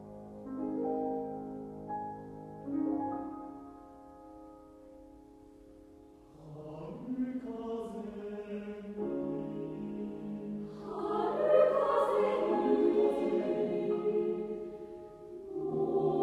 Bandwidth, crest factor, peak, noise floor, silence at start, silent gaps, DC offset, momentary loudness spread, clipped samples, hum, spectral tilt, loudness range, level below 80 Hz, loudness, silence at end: 11 kHz; 20 dB; -14 dBFS; -56 dBFS; 0 s; none; under 0.1%; 23 LU; under 0.1%; none; -8 dB/octave; 16 LU; -66 dBFS; -34 LUFS; 0 s